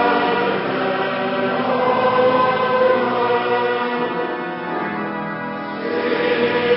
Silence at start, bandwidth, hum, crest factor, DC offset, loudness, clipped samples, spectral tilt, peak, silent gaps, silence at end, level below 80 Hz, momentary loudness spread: 0 s; 5.8 kHz; none; 14 dB; under 0.1%; -19 LUFS; under 0.1%; -10 dB/octave; -4 dBFS; none; 0 s; -60 dBFS; 9 LU